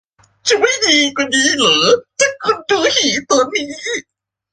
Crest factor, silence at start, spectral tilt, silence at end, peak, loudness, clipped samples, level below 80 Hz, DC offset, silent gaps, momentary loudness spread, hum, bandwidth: 16 dB; 0.45 s; -1 dB/octave; 0.5 s; 0 dBFS; -14 LUFS; under 0.1%; -56 dBFS; under 0.1%; none; 10 LU; none; 10.5 kHz